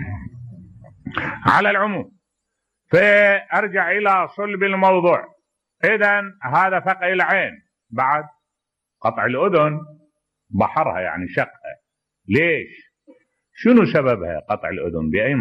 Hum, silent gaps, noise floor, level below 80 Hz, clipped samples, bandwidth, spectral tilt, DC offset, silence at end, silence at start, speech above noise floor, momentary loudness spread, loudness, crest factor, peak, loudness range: none; none; -81 dBFS; -52 dBFS; under 0.1%; 9.4 kHz; -7.5 dB/octave; under 0.1%; 0 s; 0 s; 63 dB; 15 LU; -18 LUFS; 16 dB; -4 dBFS; 5 LU